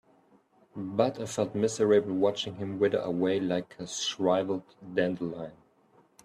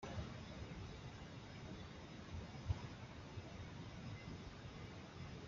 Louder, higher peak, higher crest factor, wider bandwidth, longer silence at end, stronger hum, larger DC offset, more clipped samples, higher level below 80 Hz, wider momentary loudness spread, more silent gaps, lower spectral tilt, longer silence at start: first, -29 LUFS vs -52 LUFS; first, -10 dBFS vs -28 dBFS; about the same, 18 dB vs 22 dB; first, 12.5 kHz vs 7.4 kHz; first, 0.7 s vs 0 s; neither; neither; neither; second, -70 dBFS vs -60 dBFS; first, 12 LU vs 7 LU; neither; about the same, -5 dB/octave vs -5.5 dB/octave; first, 0.75 s vs 0 s